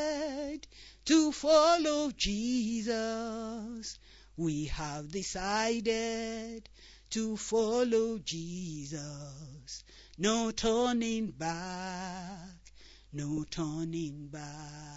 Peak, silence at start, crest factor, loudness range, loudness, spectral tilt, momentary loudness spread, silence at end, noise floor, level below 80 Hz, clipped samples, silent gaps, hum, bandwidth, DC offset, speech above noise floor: -14 dBFS; 0 s; 20 dB; 6 LU; -32 LUFS; -4 dB/octave; 18 LU; 0 s; -55 dBFS; -54 dBFS; under 0.1%; none; none; 8 kHz; under 0.1%; 23 dB